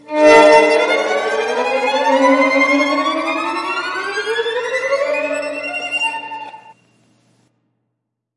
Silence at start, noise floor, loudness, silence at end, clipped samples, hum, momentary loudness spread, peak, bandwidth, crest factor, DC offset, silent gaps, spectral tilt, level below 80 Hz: 0.1 s; -75 dBFS; -15 LUFS; 1.8 s; under 0.1%; none; 12 LU; 0 dBFS; 11.5 kHz; 16 dB; under 0.1%; none; -2.5 dB/octave; -62 dBFS